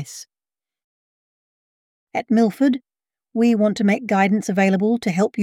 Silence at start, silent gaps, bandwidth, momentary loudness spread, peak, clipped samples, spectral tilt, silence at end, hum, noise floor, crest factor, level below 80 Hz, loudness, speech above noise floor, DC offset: 0 s; 0.84-2.07 s; 14.5 kHz; 12 LU; -4 dBFS; under 0.1%; -6.5 dB/octave; 0 s; none; under -90 dBFS; 16 dB; -68 dBFS; -19 LUFS; over 72 dB; under 0.1%